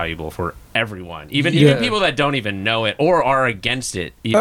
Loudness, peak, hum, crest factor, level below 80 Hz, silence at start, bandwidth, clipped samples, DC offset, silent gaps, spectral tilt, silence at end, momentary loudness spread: -18 LUFS; -2 dBFS; none; 16 dB; -44 dBFS; 0 s; 15 kHz; under 0.1%; under 0.1%; none; -5 dB/octave; 0 s; 12 LU